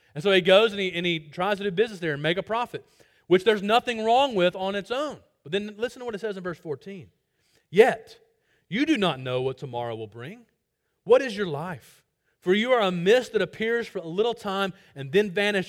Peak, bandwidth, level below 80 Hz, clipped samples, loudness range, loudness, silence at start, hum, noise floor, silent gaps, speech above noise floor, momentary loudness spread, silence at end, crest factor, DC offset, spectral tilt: -4 dBFS; 15.5 kHz; -66 dBFS; under 0.1%; 4 LU; -25 LUFS; 0.15 s; none; -77 dBFS; none; 52 dB; 15 LU; 0 s; 22 dB; under 0.1%; -5.5 dB/octave